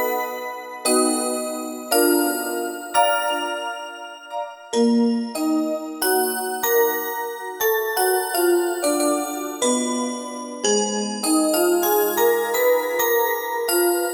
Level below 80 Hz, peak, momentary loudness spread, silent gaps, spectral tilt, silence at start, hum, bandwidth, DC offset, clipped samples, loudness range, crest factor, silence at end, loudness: -68 dBFS; -4 dBFS; 10 LU; none; -2 dB/octave; 0 s; none; over 20 kHz; under 0.1%; under 0.1%; 3 LU; 16 dB; 0 s; -21 LUFS